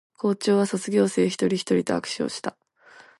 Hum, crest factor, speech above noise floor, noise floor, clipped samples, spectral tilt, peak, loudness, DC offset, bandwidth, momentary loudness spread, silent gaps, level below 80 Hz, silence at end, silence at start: none; 16 dB; 29 dB; -52 dBFS; under 0.1%; -5 dB/octave; -8 dBFS; -24 LUFS; under 0.1%; 11.5 kHz; 7 LU; none; -66 dBFS; 0.2 s; 0.25 s